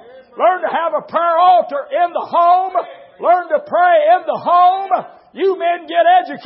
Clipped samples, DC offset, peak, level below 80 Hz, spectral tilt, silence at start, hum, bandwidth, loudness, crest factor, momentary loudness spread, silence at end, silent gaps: under 0.1%; under 0.1%; -2 dBFS; -76 dBFS; -8.5 dB/octave; 0.15 s; none; 5.6 kHz; -14 LUFS; 12 dB; 9 LU; 0 s; none